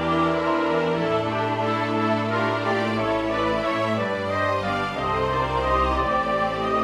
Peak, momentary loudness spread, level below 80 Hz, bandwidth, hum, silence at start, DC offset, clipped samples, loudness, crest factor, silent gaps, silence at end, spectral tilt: -10 dBFS; 3 LU; -40 dBFS; 13 kHz; none; 0 s; under 0.1%; under 0.1%; -23 LUFS; 12 dB; none; 0 s; -6.5 dB/octave